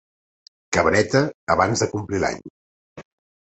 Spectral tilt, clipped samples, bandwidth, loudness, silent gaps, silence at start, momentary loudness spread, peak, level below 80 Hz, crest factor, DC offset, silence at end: -4.5 dB/octave; under 0.1%; 8.4 kHz; -21 LUFS; 1.35-1.47 s, 2.50-2.96 s; 0.7 s; 7 LU; -2 dBFS; -46 dBFS; 22 dB; under 0.1%; 0.5 s